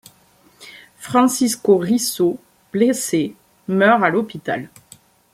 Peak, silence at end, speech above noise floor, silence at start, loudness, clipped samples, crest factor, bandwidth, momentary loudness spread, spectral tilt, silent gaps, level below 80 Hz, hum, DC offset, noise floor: -2 dBFS; 0.7 s; 37 dB; 0.6 s; -18 LUFS; under 0.1%; 18 dB; 16 kHz; 14 LU; -4.5 dB/octave; none; -62 dBFS; none; under 0.1%; -54 dBFS